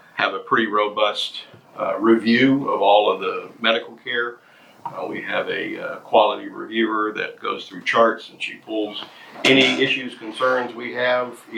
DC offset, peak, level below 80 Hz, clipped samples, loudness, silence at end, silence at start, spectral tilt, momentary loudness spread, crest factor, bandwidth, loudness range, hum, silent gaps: under 0.1%; 0 dBFS; -72 dBFS; under 0.1%; -20 LUFS; 0 s; 0.15 s; -4.5 dB/octave; 14 LU; 20 dB; 14 kHz; 4 LU; none; none